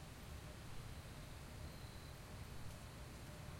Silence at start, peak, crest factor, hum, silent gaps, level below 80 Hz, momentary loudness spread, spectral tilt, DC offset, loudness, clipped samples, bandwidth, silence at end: 0 s; -38 dBFS; 14 dB; none; none; -58 dBFS; 1 LU; -4.5 dB/octave; under 0.1%; -54 LUFS; under 0.1%; 16.5 kHz; 0 s